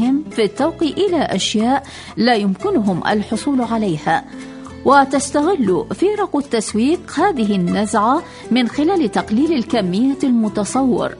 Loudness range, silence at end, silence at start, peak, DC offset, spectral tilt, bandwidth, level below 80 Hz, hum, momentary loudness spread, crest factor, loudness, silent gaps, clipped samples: 1 LU; 0 s; 0 s; 0 dBFS; under 0.1%; -5 dB/octave; 11 kHz; -48 dBFS; none; 4 LU; 16 dB; -17 LUFS; none; under 0.1%